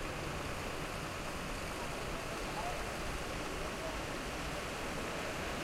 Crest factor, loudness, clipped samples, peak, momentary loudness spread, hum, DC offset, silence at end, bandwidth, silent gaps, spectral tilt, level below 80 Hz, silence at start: 12 dB; -40 LUFS; under 0.1%; -28 dBFS; 2 LU; none; under 0.1%; 0 s; 16.5 kHz; none; -4 dB/octave; -48 dBFS; 0 s